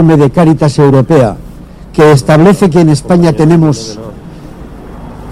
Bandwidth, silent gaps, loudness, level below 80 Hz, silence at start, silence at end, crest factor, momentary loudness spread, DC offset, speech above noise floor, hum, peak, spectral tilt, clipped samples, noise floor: 13 kHz; none; -7 LUFS; -32 dBFS; 0 s; 0 s; 8 dB; 22 LU; under 0.1%; 22 dB; none; 0 dBFS; -7.5 dB/octave; 1%; -28 dBFS